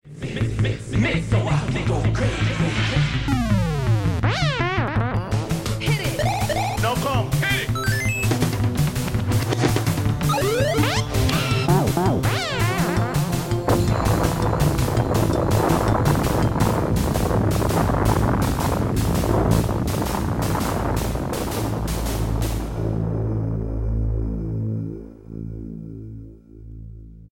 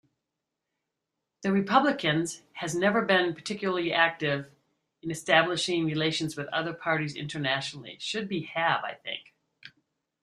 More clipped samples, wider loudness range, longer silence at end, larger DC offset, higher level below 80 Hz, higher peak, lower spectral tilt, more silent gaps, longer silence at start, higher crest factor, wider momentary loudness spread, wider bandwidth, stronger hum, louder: neither; about the same, 5 LU vs 4 LU; second, 0.05 s vs 0.55 s; neither; first, -30 dBFS vs -70 dBFS; about the same, -4 dBFS vs -6 dBFS; first, -6 dB/octave vs -4.5 dB/octave; neither; second, 0.05 s vs 1.4 s; second, 16 dB vs 24 dB; second, 7 LU vs 12 LU; first, 17 kHz vs 13 kHz; neither; first, -22 LUFS vs -28 LUFS